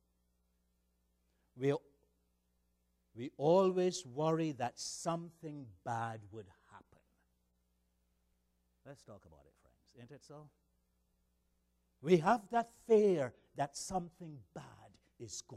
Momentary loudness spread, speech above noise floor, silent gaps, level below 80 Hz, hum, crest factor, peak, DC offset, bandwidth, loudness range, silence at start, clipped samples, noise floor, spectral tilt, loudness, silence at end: 24 LU; 43 dB; none; -74 dBFS; 60 Hz at -70 dBFS; 24 dB; -16 dBFS; under 0.1%; 13.5 kHz; 14 LU; 1.55 s; under 0.1%; -79 dBFS; -5.5 dB/octave; -35 LUFS; 0 s